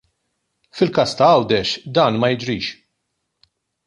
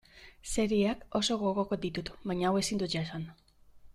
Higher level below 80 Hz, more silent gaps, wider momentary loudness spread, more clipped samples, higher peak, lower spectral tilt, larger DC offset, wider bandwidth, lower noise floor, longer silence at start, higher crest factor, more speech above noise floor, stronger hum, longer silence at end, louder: about the same, -54 dBFS vs -54 dBFS; neither; about the same, 11 LU vs 10 LU; neither; first, -2 dBFS vs -16 dBFS; about the same, -5.5 dB/octave vs -4.5 dB/octave; neither; second, 11.5 kHz vs 13.5 kHz; first, -74 dBFS vs -55 dBFS; first, 0.75 s vs 0.15 s; about the same, 18 dB vs 16 dB; first, 57 dB vs 24 dB; neither; first, 1.15 s vs 0.05 s; first, -18 LUFS vs -32 LUFS